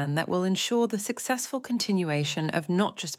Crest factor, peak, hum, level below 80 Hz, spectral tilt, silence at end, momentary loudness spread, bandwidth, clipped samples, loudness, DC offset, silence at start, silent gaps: 14 dB; -12 dBFS; none; -76 dBFS; -4.5 dB/octave; 0.05 s; 4 LU; 16.5 kHz; under 0.1%; -28 LUFS; under 0.1%; 0 s; none